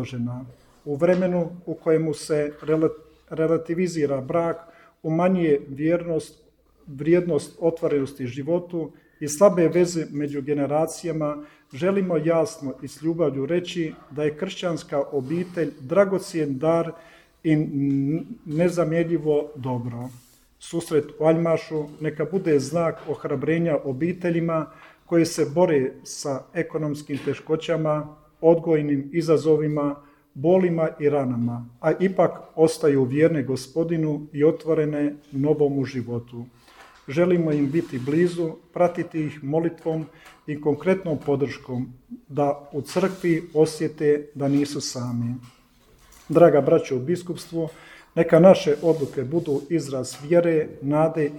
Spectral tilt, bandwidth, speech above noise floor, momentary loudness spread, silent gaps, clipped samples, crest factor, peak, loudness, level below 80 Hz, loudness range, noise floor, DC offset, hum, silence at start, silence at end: -7 dB/octave; 17.5 kHz; 33 dB; 11 LU; none; under 0.1%; 22 dB; -2 dBFS; -23 LUFS; -60 dBFS; 4 LU; -56 dBFS; under 0.1%; none; 0 s; 0 s